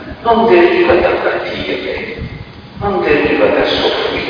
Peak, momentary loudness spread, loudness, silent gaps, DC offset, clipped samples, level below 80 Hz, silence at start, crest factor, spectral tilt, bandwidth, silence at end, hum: 0 dBFS; 16 LU; -13 LUFS; none; under 0.1%; under 0.1%; -36 dBFS; 0 s; 14 dB; -6.5 dB/octave; 5.2 kHz; 0 s; none